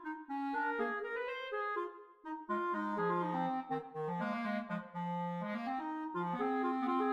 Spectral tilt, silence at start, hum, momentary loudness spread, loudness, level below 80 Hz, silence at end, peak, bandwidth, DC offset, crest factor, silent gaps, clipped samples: -8 dB/octave; 0 s; none; 6 LU; -38 LUFS; -80 dBFS; 0 s; -24 dBFS; 8.4 kHz; under 0.1%; 14 dB; none; under 0.1%